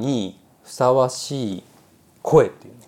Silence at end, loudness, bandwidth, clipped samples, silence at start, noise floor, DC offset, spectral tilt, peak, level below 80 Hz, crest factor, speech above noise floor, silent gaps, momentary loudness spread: 0.2 s; -20 LUFS; 15.5 kHz; under 0.1%; 0 s; -54 dBFS; under 0.1%; -6 dB/octave; -2 dBFS; -58 dBFS; 20 dB; 33 dB; none; 16 LU